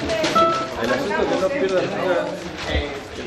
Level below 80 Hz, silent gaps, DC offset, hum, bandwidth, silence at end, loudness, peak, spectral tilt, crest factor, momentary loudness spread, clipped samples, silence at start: -38 dBFS; none; under 0.1%; none; 13.5 kHz; 0 s; -21 LUFS; -4 dBFS; -4.5 dB/octave; 18 dB; 8 LU; under 0.1%; 0 s